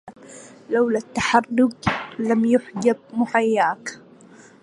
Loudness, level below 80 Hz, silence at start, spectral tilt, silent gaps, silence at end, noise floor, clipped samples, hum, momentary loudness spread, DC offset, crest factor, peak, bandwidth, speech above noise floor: -21 LUFS; -54 dBFS; 0.05 s; -5 dB/octave; none; 0.65 s; -47 dBFS; under 0.1%; none; 18 LU; under 0.1%; 20 dB; -2 dBFS; 11 kHz; 27 dB